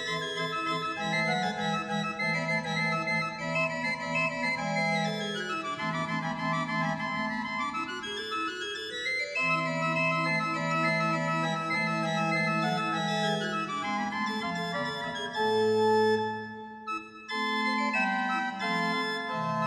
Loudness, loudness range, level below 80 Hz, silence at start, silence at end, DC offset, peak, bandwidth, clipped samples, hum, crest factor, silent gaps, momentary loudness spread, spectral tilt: -29 LUFS; 3 LU; -68 dBFS; 0 s; 0 s; under 0.1%; -16 dBFS; 13 kHz; under 0.1%; none; 14 dB; none; 6 LU; -4.5 dB/octave